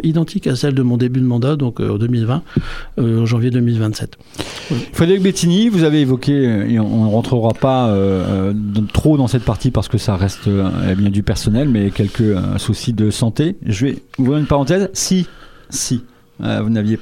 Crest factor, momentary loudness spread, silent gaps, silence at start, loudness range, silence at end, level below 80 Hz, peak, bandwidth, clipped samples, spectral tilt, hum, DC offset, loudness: 16 dB; 8 LU; none; 0 s; 3 LU; 0 s; -36 dBFS; 0 dBFS; 15.5 kHz; under 0.1%; -6.5 dB/octave; none; under 0.1%; -16 LUFS